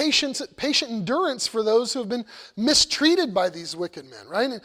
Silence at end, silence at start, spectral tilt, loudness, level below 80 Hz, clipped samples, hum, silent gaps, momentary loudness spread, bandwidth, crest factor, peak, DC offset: 0.05 s; 0 s; -2.5 dB/octave; -23 LUFS; -58 dBFS; under 0.1%; none; none; 13 LU; 16 kHz; 18 dB; -6 dBFS; under 0.1%